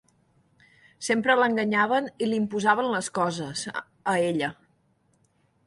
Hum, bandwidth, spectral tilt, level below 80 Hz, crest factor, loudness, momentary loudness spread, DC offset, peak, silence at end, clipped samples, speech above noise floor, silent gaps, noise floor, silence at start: none; 11.5 kHz; -4 dB/octave; -70 dBFS; 20 dB; -25 LUFS; 10 LU; under 0.1%; -6 dBFS; 1.15 s; under 0.1%; 42 dB; none; -67 dBFS; 1 s